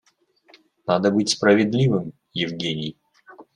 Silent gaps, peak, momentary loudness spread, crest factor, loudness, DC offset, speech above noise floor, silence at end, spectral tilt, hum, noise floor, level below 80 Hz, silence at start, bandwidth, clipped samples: none; -4 dBFS; 14 LU; 18 dB; -21 LUFS; under 0.1%; 40 dB; 0.15 s; -5 dB/octave; none; -60 dBFS; -62 dBFS; 0.85 s; 11 kHz; under 0.1%